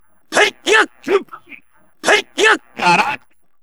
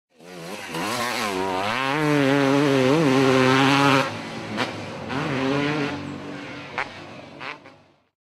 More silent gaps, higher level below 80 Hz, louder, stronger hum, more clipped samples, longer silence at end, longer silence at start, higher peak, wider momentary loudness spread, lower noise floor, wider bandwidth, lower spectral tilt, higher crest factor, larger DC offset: neither; about the same, -64 dBFS vs -62 dBFS; first, -15 LUFS vs -22 LUFS; neither; neither; second, 0.45 s vs 0.65 s; about the same, 0.3 s vs 0.25 s; first, 0 dBFS vs -4 dBFS; second, 8 LU vs 18 LU; second, -45 dBFS vs -51 dBFS; first, over 20 kHz vs 15 kHz; second, -2 dB/octave vs -5 dB/octave; about the same, 18 dB vs 18 dB; first, 0.4% vs under 0.1%